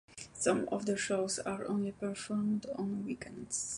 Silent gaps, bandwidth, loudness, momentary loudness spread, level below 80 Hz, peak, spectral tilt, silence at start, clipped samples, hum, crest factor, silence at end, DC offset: none; 11.5 kHz; -35 LUFS; 7 LU; -66 dBFS; -16 dBFS; -4 dB/octave; 0.1 s; under 0.1%; none; 20 dB; 0 s; under 0.1%